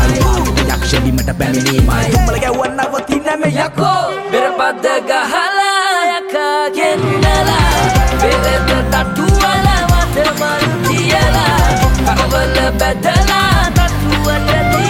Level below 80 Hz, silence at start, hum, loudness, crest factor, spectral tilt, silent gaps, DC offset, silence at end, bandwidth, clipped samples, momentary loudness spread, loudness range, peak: -20 dBFS; 0 s; none; -13 LUFS; 12 dB; -4.5 dB/octave; none; under 0.1%; 0 s; 17 kHz; under 0.1%; 4 LU; 2 LU; 0 dBFS